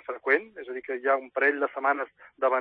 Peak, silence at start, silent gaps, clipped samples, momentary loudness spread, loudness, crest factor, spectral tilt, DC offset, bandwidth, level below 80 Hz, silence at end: -8 dBFS; 0.1 s; none; under 0.1%; 13 LU; -27 LUFS; 18 dB; -6 dB/octave; under 0.1%; 5.2 kHz; -80 dBFS; 0 s